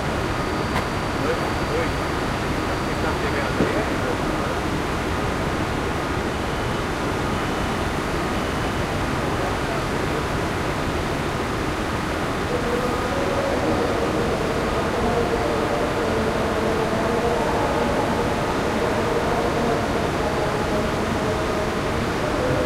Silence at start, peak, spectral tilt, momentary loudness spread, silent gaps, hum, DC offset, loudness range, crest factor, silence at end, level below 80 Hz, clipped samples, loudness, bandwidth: 0 s; -6 dBFS; -5.5 dB/octave; 3 LU; none; none; under 0.1%; 2 LU; 16 dB; 0 s; -34 dBFS; under 0.1%; -23 LUFS; 16 kHz